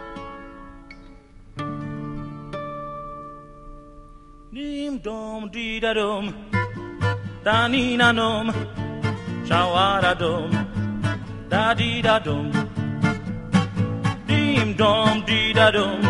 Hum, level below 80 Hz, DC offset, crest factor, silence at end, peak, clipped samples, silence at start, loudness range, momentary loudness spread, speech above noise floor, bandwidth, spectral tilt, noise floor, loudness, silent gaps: none; -44 dBFS; under 0.1%; 22 dB; 0 s; -2 dBFS; under 0.1%; 0 s; 14 LU; 17 LU; 25 dB; 11.5 kHz; -6 dB/octave; -45 dBFS; -22 LUFS; none